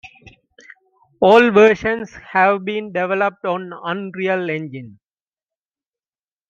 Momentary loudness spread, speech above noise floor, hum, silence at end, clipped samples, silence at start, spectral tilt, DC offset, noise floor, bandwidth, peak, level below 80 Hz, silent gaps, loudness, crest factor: 14 LU; over 73 dB; none; 1.6 s; under 0.1%; 0.05 s; -6 dB/octave; under 0.1%; under -90 dBFS; 7.4 kHz; -2 dBFS; -56 dBFS; none; -17 LUFS; 18 dB